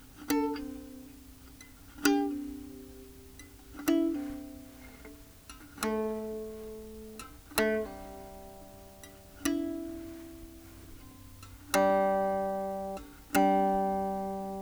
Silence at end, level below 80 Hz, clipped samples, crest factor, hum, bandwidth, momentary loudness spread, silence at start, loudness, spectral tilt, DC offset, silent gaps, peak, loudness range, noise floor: 0 s; -56 dBFS; under 0.1%; 26 dB; none; over 20 kHz; 23 LU; 0 s; -32 LUFS; -4.5 dB/octave; under 0.1%; none; -8 dBFS; 10 LU; -52 dBFS